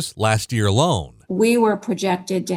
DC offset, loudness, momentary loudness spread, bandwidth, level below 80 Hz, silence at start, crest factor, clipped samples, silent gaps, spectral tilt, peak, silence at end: under 0.1%; -20 LUFS; 6 LU; 16 kHz; -48 dBFS; 0 s; 16 dB; under 0.1%; none; -5.5 dB/octave; -4 dBFS; 0 s